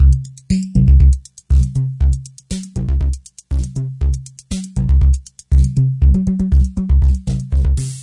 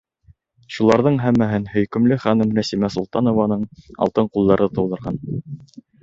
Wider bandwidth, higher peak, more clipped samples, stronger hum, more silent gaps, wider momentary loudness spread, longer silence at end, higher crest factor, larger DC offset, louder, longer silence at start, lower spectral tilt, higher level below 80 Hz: first, 11 kHz vs 7.8 kHz; about the same, -2 dBFS vs -2 dBFS; neither; neither; neither; about the same, 11 LU vs 13 LU; second, 0 s vs 0.2 s; second, 12 dB vs 18 dB; neither; about the same, -17 LUFS vs -19 LUFS; second, 0 s vs 0.7 s; about the same, -7.5 dB/octave vs -7.5 dB/octave; first, -16 dBFS vs -48 dBFS